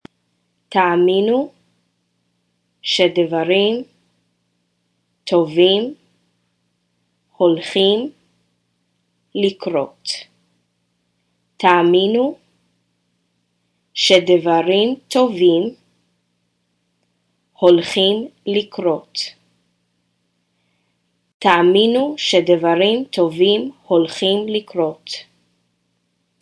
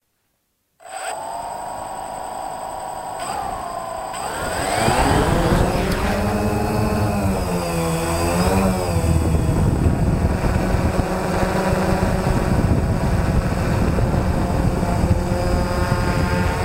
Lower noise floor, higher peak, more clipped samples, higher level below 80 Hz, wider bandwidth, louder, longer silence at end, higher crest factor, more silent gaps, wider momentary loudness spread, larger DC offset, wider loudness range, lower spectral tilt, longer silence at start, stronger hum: about the same, -68 dBFS vs -69 dBFS; first, 0 dBFS vs -4 dBFS; neither; second, -68 dBFS vs -26 dBFS; second, 11 kHz vs 16 kHz; first, -16 LUFS vs -21 LUFS; first, 1.2 s vs 0 s; about the same, 18 dB vs 16 dB; first, 21.34-21.40 s vs none; about the same, 13 LU vs 11 LU; neither; about the same, 6 LU vs 8 LU; second, -4.5 dB/octave vs -6 dB/octave; second, 0.7 s vs 0.85 s; neither